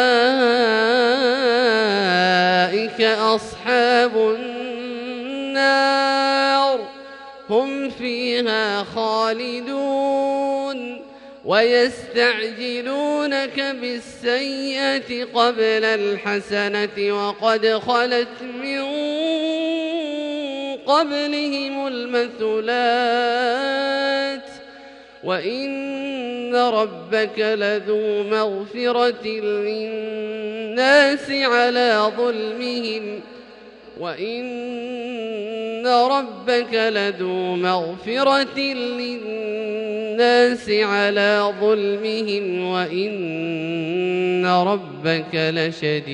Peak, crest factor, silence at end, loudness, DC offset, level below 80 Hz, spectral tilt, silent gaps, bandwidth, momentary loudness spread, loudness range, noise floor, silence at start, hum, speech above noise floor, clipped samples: -2 dBFS; 18 dB; 0 s; -20 LUFS; under 0.1%; -64 dBFS; -4.5 dB/octave; none; 10.5 kHz; 11 LU; 4 LU; -43 dBFS; 0 s; none; 22 dB; under 0.1%